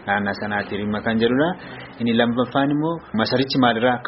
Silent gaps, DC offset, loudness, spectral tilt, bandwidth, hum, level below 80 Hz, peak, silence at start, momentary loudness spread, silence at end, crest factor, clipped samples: none; under 0.1%; -21 LUFS; -4 dB/octave; 6 kHz; none; -52 dBFS; -4 dBFS; 0 s; 7 LU; 0 s; 18 dB; under 0.1%